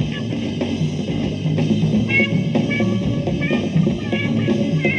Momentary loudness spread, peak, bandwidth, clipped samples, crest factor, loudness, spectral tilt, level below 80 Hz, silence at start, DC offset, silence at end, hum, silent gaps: 6 LU; -6 dBFS; 8.8 kHz; under 0.1%; 14 dB; -19 LUFS; -7 dB/octave; -42 dBFS; 0 s; under 0.1%; 0 s; none; none